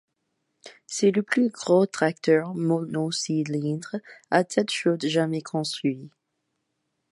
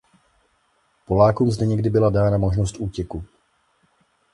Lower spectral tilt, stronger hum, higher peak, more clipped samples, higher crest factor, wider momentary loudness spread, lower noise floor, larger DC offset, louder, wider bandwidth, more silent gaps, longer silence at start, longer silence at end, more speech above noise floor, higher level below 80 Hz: second, -5 dB/octave vs -8 dB/octave; neither; about the same, -6 dBFS vs -4 dBFS; neither; about the same, 20 dB vs 18 dB; second, 8 LU vs 13 LU; first, -78 dBFS vs -65 dBFS; neither; second, -25 LUFS vs -20 LUFS; about the same, 11.5 kHz vs 11.5 kHz; neither; second, 0.65 s vs 1.1 s; about the same, 1.05 s vs 1.1 s; first, 54 dB vs 46 dB; second, -76 dBFS vs -38 dBFS